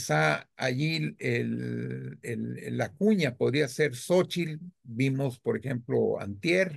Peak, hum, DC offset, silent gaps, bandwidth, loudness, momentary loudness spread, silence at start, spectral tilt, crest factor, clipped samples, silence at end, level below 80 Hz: -12 dBFS; none; under 0.1%; none; 12.5 kHz; -29 LUFS; 10 LU; 0 s; -6 dB/octave; 18 dB; under 0.1%; 0 s; -70 dBFS